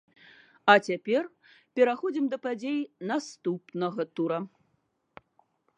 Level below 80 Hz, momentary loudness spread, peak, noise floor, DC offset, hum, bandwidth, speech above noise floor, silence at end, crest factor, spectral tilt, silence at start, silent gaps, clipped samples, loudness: -82 dBFS; 12 LU; -4 dBFS; -74 dBFS; under 0.1%; none; 10 kHz; 47 dB; 1.3 s; 26 dB; -5 dB/octave; 0.65 s; none; under 0.1%; -28 LUFS